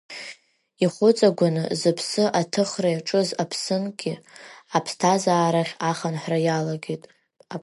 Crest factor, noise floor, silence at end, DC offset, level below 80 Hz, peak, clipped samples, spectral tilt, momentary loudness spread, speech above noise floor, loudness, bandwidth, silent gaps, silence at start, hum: 18 dB; -50 dBFS; 0 s; under 0.1%; -74 dBFS; -4 dBFS; under 0.1%; -5 dB/octave; 15 LU; 28 dB; -23 LUFS; 11.5 kHz; none; 0.1 s; none